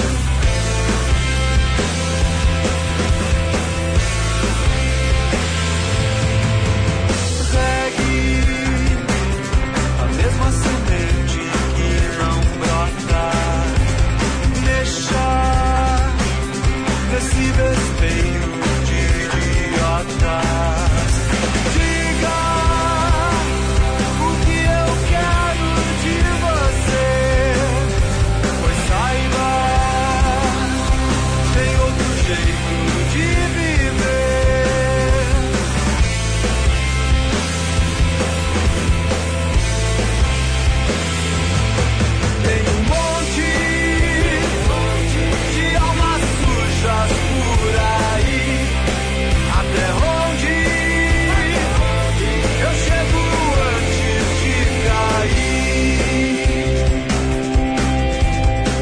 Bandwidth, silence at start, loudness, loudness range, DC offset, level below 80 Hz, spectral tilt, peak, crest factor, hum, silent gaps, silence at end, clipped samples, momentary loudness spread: 10.5 kHz; 0 s; -17 LUFS; 1 LU; under 0.1%; -20 dBFS; -5 dB/octave; -4 dBFS; 12 dB; none; none; 0 s; under 0.1%; 2 LU